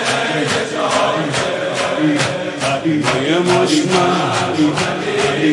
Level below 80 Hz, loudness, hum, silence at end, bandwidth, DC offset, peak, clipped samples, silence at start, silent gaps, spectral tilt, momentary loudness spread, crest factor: -54 dBFS; -16 LUFS; none; 0 s; 11.5 kHz; under 0.1%; -2 dBFS; under 0.1%; 0 s; none; -4.5 dB/octave; 4 LU; 14 dB